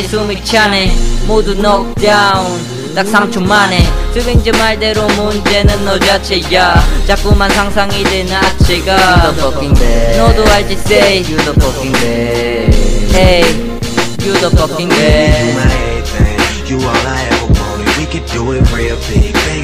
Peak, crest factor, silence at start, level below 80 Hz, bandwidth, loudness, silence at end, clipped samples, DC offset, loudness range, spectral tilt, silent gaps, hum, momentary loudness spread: 0 dBFS; 10 dB; 0 s; -16 dBFS; 16 kHz; -11 LUFS; 0 s; 0.2%; under 0.1%; 2 LU; -4.5 dB/octave; none; none; 7 LU